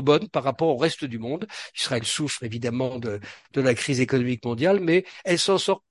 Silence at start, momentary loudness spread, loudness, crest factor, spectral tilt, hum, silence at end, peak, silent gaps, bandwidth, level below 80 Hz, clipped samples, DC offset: 0 s; 10 LU; -24 LUFS; 18 dB; -4.5 dB/octave; none; 0.1 s; -6 dBFS; none; 11.5 kHz; -60 dBFS; under 0.1%; under 0.1%